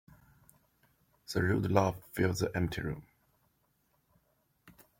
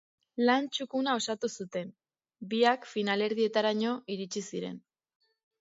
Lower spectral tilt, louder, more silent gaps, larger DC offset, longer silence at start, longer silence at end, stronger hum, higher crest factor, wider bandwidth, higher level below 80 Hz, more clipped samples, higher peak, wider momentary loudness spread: first, -6 dB/octave vs -4 dB/octave; about the same, -32 LUFS vs -30 LUFS; neither; neither; first, 1.3 s vs 0.35 s; second, 0.3 s vs 0.8 s; neither; about the same, 24 dB vs 22 dB; first, 16.5 kHz vs 7.8 kHz; first, -58 dBFS vs -82 dBFS; neither; about the same, -12 dBFS vs -10 dBFS; second, 10 LU vs 13 LU